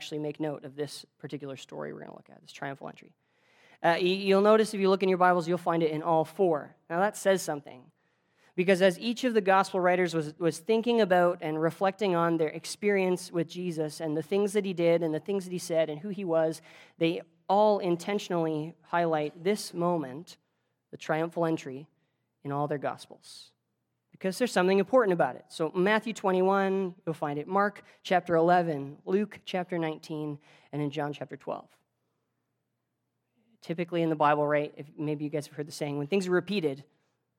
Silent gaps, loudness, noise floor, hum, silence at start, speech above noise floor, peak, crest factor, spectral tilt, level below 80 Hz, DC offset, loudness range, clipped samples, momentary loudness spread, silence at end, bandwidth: none; -28 LUFS; -81 dBFS; none; 0 s; 53 dB; -8 dBFS; 20 dB; -5.5 dB/octave; -84 dBFS; under 0.1%; 10 LU; under 0.1%; 15 LU; 0.55 s; 16.5 kHz